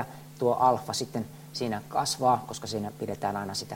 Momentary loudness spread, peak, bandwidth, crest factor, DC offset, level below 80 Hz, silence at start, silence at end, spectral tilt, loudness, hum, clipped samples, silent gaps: 10 LU; -10 dBFS; 16.5 kHz; 20 dB; under 0.1%; -64 dBFS; 0 s; 0 s; -4.5 dB/octave; -29 LUFS; none; under 0.1%; none